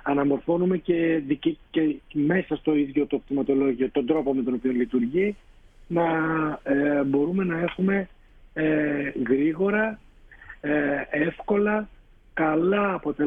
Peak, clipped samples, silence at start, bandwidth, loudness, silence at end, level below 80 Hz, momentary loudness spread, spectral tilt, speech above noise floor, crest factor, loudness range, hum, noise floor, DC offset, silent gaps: -10 dBFS; under 0.1%; 0.05 s; 3.8 kHz; -25 LUFS; 0 s; -52 dBFS; 5 LU; -9.5 dB/octave; 23 dB; 16 dB; 1 LU; none; -47 dBFS; under 0.1%; none